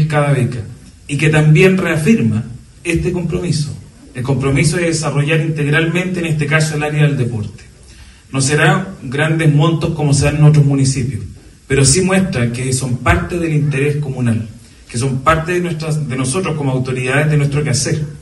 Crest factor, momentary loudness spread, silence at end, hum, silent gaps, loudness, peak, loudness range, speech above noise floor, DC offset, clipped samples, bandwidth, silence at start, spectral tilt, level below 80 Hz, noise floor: 14 dB; 12 LU; 0 s; none; none; -15 LUFS; 0 dBFS; 4 LU; 25 dB; under 0.1%; under 0.1%; 12 kHz; 0 s; -5.5 dB/octave; -36 dBFS; -39 dBFS